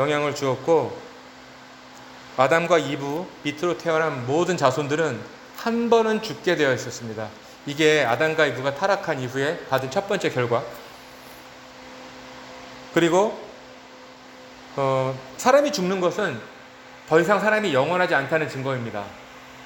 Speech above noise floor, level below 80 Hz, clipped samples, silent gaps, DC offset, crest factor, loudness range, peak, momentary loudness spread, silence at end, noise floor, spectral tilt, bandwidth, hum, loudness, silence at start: 22 dB; -62 dBFS; under 0.1%; none; under 0.1%; 20 dB; 6 LU; -4 dBFS; 23 LU; 0 s; -44 dBFS; -5 dB/octave; 17 kHz; none; -22 LUFS; 0 s